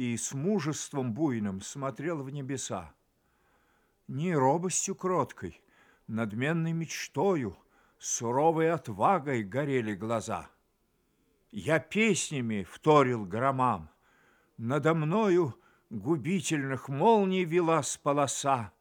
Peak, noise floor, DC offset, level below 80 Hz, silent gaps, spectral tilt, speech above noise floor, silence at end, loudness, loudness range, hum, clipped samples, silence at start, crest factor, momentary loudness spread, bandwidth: -10 dBFS; -73 dBFS; under 0.1%; -68 dBFS; none; -5 dB/octave; 44 dB; 0.1 s; -29 LUFS; 5 LU; none; under 0.1%; 0 s; 20 dB; 11 LU; 18.5 kHz